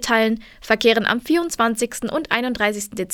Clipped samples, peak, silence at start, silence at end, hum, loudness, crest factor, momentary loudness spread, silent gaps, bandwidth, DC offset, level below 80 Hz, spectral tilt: under 0.1%; 0 dBFS; 0 s; 0 s; none; -20 LUFS; 20 dB; 8 LU; none; 19 kHz; under 0.1%; -50 dBFS; -3 dB/octave